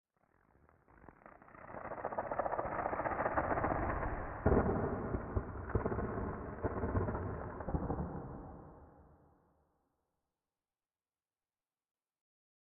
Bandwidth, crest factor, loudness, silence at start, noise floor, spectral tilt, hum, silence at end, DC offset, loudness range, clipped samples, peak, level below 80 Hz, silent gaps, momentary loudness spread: 3.1 kHz; 22 dB; -38 LUFS; 1 s; under -90 dBFS; -4.5 dB/octave; none; 3.6 s; under 0.1%; 10 LU; under 0.1%; -18 dBFS; -50 dBFS; none; 17 LU